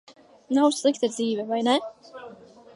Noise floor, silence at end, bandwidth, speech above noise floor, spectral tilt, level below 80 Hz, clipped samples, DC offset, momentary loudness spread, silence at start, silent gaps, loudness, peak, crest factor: -47 dBFS; 0.4 s; 11.5 kHz; 23 dB; -3.5 dB/octave; -78 dBFS; under 0.1%; under 0.1%; 22 LU; 0.1 s; none; -24 LUFS; -8 dBFS; 18 dB